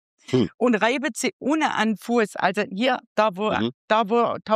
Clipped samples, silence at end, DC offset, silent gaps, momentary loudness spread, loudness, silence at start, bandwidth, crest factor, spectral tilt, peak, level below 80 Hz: under 0.1%; 0 s; under 0.1%; 0.54-0.58 s, 1.33-1.40 s, 3.07-3.16 s, 3.74-3.88 s; 4 LU; -23 LUFS; 0.3 s; 15.5 kHz; 18 dB; -4.5 dB/octave; -6 dBFS; -66 dBFS